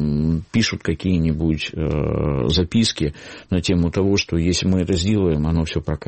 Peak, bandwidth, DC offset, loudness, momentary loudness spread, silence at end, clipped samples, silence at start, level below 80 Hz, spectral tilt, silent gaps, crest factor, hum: -6 dBFS; 8.8 kHz; under 0.1%; -20 LUFS; 5 LU; 0 s; under 0.1%; 0 s; -32 dBFS; -5.5 dB/octave; none; 12 dB; none